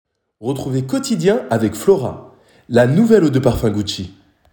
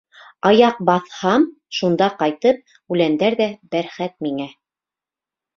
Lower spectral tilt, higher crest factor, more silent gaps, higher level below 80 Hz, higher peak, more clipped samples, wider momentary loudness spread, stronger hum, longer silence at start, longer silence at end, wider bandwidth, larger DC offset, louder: about the same, -6.5 dB/octave vs -6 dB/octave; about the same, 16 dB vs 18 dB; neither; first, -40 dBFS vs -62 dBFS; about the same, -2 dBFS vs -2 dBFS; neither; first, 15 LU vs 11 LU; neither; about the same, 0.4 s vs 0.45 s; second, 0.4 s vs 1.05 s; first, 18.5 kHz vs 7.2 kHz; neither; first, -16 LUFS vs -19 LUFS